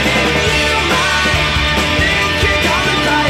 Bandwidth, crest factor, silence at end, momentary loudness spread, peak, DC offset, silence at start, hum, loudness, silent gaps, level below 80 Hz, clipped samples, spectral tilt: 16.5 kHz; 10 dB; 0 s; 1 LU; -4 dBFS; under 0.1%; 0 s; none; -12 LUFS; none; -26 dBFS; under 0.1%; -3.5 dB/octave